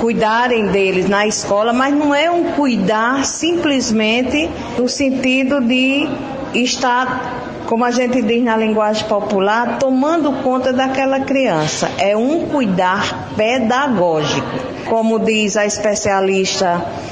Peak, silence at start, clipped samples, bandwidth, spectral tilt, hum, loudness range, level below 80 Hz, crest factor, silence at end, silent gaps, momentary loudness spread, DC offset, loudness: -2 dBFS; 0 s; under 0.1%; 9.8 kHz; -4 dB/octave; none; 1 LU; -46 dBFS; 14 dB; 0 s; none; 4 LU; under 0.1%; -15 LUFS